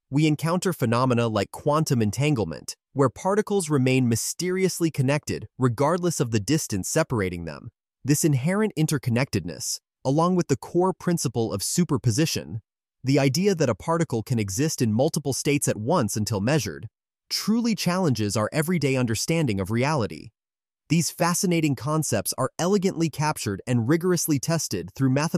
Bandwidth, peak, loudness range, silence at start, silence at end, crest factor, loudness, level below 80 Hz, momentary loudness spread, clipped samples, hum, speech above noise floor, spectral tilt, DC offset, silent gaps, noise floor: 15.5 kHz; -8 dBFS; 1 LU; 0.1 s; 0 s; 16 dB; -24 LUFS; -56 dBFS; 6 LU; under 0.1%; none; over 66 dB; -5 dB/octave; under 0.1%; none; under -90 dBFS